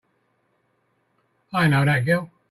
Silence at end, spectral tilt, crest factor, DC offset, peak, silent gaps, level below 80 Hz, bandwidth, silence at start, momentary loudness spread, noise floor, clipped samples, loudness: 0.25 s; -7 dB/octave; 16 dB; under 0.1%; -8 dBFS; none; -58 dBFS; 13.5 kHz; 1.55 s; 6 LU; -69 dBFS; under 0.1%; -21 LUFS